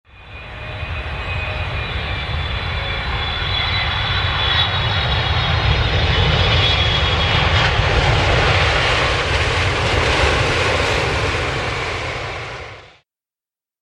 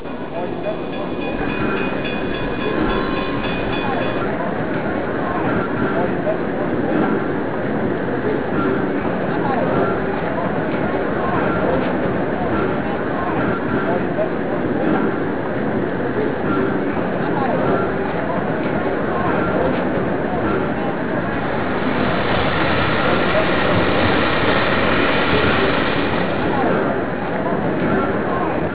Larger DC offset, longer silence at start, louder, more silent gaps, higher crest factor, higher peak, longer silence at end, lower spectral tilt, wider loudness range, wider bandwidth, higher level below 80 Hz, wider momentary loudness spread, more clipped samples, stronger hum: second, under 0.1% vs 3%; first, 0.15 s vs 0 s; about the same, -17 LUFS vs -19 LUFS; neither; about the same, 16 dB vs 16 dB; about the same, -2 dBFS vs -4 dBFS; first, 0.95 s vs 0 s; second, -4.5 dB/octave vs -10 dB/octave; about the same, 6 LU vs 4 LU; first, 11.5 kHz vs 4 kHz; first, -26 dBFS vs -38 dBFS; first, 11 LU vs 5 LU; neither; neither